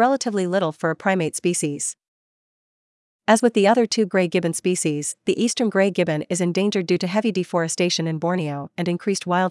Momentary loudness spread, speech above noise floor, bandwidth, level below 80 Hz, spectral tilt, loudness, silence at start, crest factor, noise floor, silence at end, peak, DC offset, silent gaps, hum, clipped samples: 8 LU; over 69 dB; 12 kHz; -74 dBFS; -4.5 dB/octave; -21 LUFS; 0 s; 18 dB; under -90 dBFS; 0 s; -4 dBFS; under 0.1%; 2.08-3.19 s; none; under 0.1%